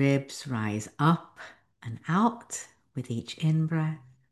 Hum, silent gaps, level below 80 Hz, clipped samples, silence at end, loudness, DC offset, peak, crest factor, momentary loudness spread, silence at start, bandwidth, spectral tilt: none; none; -66 dBFS; under 0.1%; 0.35 s; -29 LUFS; under 0.1%; -10 dBFS; 20 dB; 17 LU; 0 s; 12.5 kHz; -6 dB/octave